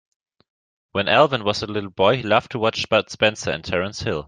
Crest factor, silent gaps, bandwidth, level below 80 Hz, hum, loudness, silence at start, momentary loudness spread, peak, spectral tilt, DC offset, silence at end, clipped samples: 20 dB; none; 9.6 kHz; -54 dBFS; none; -20 LUFS; 0.95 s; 9 LU; -2 dBFS; -4.5 dB/octave; under 0.1%; 0.05 s; under 0.1%